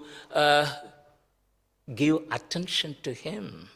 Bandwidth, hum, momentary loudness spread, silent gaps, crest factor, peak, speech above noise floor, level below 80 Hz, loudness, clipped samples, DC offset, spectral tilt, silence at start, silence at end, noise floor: 16 kHz; none; 16 LU; none; 22 dB; -8 dBFS; 44 dB; -66 dBFS; -27 LUFS; under 0.1%; under 0.1%; -4.5 dB/octave; 0 s; 0.1 s; -71 dBFS